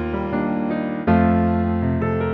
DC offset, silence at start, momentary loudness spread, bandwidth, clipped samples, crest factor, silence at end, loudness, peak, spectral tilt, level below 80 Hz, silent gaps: under 0.1%; 0 s; 6 LU; 4.6 kHz; under 0.1%; 14 dB; 0 s; -20 LUFS; -4 dBFS; -11 dB/octave; -36 dBFS; none